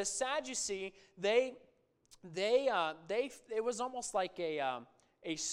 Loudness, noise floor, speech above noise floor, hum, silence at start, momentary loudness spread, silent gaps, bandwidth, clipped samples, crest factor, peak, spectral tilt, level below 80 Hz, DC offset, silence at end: -36 LUFS; -67 dBFS; 31 dB; none; 0 s; 11 LU; none; 14.5 kHz; under 0.1%; 20 dB; -18 dBFS; -2 dB/octave; -74 dBFS; under 0.1%; 0 s